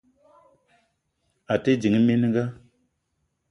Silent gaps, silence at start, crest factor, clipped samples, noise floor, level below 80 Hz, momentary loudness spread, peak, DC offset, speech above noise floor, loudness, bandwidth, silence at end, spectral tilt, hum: none; 1.5 s; 20 dB; under 0.1%; -75 dBFS; -60 dBFS; 8 LU; -6 dBFS; under 0.1%; 54 dB; -23 LUFS; 7.6 kHz; 0.95 s; -7.5 dB/octave; none